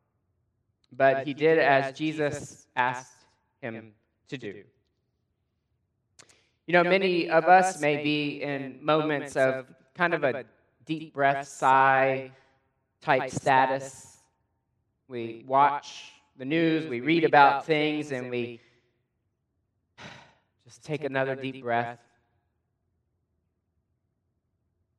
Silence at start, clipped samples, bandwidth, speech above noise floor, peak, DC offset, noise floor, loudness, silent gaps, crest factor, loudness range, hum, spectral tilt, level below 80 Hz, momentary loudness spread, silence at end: 0.9 s; under 0.1%; 12 kHz; 52 dB; -4 dBFS; under 0.1%; -78 dBFS; -25 LUFS; none; 24 dB; 12 LU; none; -5 dB/octave; -74 dBFS; 19 LU; 3.05 s